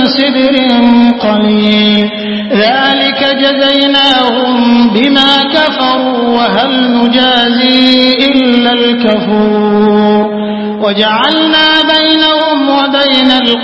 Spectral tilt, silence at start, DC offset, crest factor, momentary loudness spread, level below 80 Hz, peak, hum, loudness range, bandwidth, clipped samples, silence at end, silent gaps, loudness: -6 dB/octave; 0 s; 0.4%; 8 dB; 4 LU; -46 dBFS; 0 dBFS; none; 1 LU; 8 kHz; 0.4%; 0 s; none; -8 LUFS